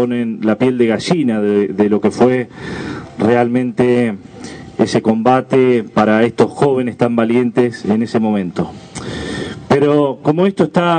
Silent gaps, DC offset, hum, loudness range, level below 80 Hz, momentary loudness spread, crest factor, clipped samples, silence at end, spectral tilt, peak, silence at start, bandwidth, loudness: none; under 0.1%; none; 2 LU; -50 dBFS; 12 LU; 14 dB; under 0.1%; 0 s; -7 dB/octave; 0 dBFS; 0 s; 9.4 kHz; -15 LUFS